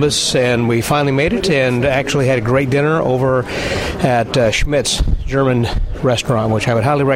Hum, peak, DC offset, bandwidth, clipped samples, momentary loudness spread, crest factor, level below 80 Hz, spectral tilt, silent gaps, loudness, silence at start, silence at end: none; -2 dBFS; under 0.1%; 16 kHz; under 0.1%; 4 LU; 12 dB; -26 dBFS; -5 dB/octave; none; -15 LUFS; 0 s; 0 s